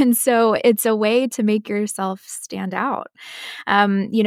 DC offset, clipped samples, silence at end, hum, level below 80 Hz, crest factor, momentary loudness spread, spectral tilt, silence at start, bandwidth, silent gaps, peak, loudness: under 0.1%; under 0.1%; 0 s; none; -68 dBFS; 16 dB; 14 LU; -4.5 dB/octave; 0 s; 16 kHz; none; -2 dBFS; -19 LUFS